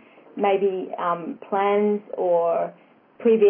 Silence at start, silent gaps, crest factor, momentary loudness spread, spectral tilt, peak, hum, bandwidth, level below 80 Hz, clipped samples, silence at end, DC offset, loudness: 0.35 s; none; 14 dB; 7 LU; -10.5 dB/octave; -8 dBFS; none; 3.5 kHz; under -90 dBFS; under 0.1%; 0 s; under 0.1%; -23 LUFS